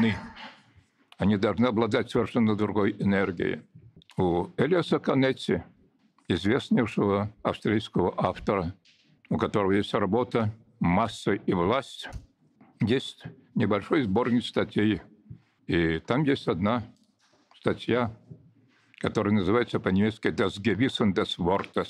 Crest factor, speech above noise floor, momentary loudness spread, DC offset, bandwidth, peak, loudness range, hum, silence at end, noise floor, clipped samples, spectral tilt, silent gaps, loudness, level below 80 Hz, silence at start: 20 dB; 39 dB; 8 LU; under 0.1%; 11 kHz; -6 dBFS; 2 LU; none; 0 s; -65 dBFS; under 0.1%; -7 dB/octave; none; -27 LUFS; -54 dBFS; 0 s